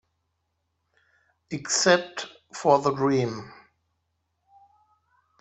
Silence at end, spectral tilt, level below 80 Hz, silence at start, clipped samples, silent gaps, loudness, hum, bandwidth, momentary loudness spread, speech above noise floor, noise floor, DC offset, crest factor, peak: 1.9 s; -3.5 dB/octave; -68 dBFS; 1.5 s; under 0.1%; none; -23 LUFS; none; 8.4 kHz; 17 LU; 53 dB; -77 dBFS; under 0.1%; 24 dB; -6 dBFS